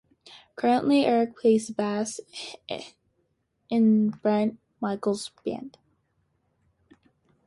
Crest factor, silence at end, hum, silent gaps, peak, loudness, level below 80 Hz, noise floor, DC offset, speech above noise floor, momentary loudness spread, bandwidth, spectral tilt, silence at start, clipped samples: 18 dB; 1.75 s; none; none; -10 dBFS; -26 LUFS; -70 dBFS; -73 dBFS; under 0.1%; 48 dB; 17 LU; 11.5 kHz; -5.5 dB/octave; 0.3 s; under 0.1%